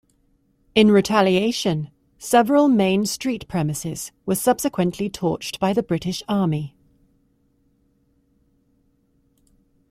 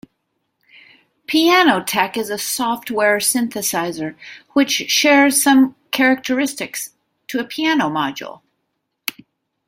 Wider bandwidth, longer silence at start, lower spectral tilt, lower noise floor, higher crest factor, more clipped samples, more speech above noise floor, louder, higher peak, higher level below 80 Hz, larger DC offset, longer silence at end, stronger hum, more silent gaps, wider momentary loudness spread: about the same, 16 kHz vs 16.5 kHz; second, 0.75 s vs 1.3 s; first, -5 dB/octave vs -2 dB/octave; second, -63 dBFS vs -73 dBFS; about the same, 20 dB vs 18 dB; neither; second, 44 dB vs 56 dB; second, -20 LUFS vs -17 LUFS; about the same, -2 dBFS vs 0 dBFS; first, -54 dBFS vs -64 dBFS; neither; first, 3.2 s vs 1.35 s; neither; neither; second, 13 LU vs 16 LU